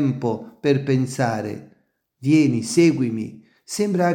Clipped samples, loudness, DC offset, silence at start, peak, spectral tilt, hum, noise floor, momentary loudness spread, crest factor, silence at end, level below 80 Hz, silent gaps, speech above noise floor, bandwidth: under 0.1%; -21 LUFS; under 0.1%; 0 s; -4 dBFS; -6.5 dB/octave; none; -62 dBFS; 14 LU; 16 dB; 0 s; -66 dBFS; none; 42 dB; 16.5 kHz